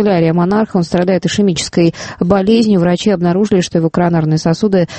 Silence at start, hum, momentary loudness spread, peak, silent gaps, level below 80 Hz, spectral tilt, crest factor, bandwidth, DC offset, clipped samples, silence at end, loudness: 0 s; none; 3 LU; 0 dBFS; none; -42 dBFS; -6.5 dB/octave; 12 dB; 8.8 kHz; under 0.1%; under 0.1%; 0 s; -13 LUFS